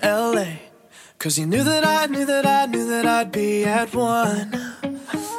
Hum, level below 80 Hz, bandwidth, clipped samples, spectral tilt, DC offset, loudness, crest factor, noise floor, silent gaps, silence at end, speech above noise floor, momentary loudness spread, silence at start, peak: none; -60 dBFS; 16.5 kHz; under 0.1%; -4 dB/octave; under 0.1%; -21 LUFS; 16 dB; -48 dBFS; none; 0 s; 28 dB; 11 LU; 0 s; -4 dBFS